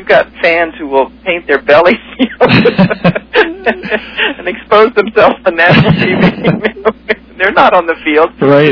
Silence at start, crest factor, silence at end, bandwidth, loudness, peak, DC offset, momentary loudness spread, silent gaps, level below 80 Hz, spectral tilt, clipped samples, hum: 0 s; 10 dB; 0 s; 5.4 kHz; -10 LUFS; 0 dBFS; under 0.1%; 8 LU; none; -40 dBFS; -8 dB/octave; 2%; none